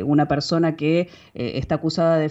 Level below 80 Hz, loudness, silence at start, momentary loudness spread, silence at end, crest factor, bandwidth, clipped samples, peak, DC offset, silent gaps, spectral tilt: -48 dBFS; -22 LUFS; 0 s; 9 LU; 0 s; 14 dB; 8 kHz; under 0.1%; -8 dBFS; under 0.1%; none; -7 dB/octave